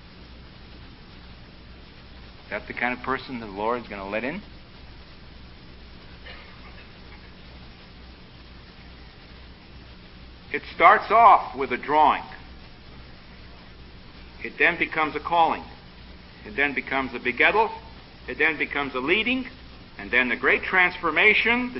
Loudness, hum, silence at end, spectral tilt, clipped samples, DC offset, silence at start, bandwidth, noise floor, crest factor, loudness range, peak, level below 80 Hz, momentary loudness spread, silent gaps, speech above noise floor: -22 LUFS; none; 0 s; -8.5 dB/octave; under 0.1%; under 0.1%; 0.1 s; 5.8 kHz; -45 dBFS; 24 dB; 24 LU; -2 dBFS; -48 dBFS; 26 LU; none; 23 dB